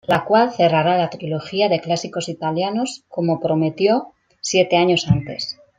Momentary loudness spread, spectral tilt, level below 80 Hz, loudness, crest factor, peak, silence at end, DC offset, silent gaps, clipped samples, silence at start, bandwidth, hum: 10 LU; -5 dB/octave; -50 dBFS; -19 LUFS; 16 dB; -2 dBFS; 0.25 s; under 0.1%; none; under 0.1%; 0.1 s; 9.6 kHz; none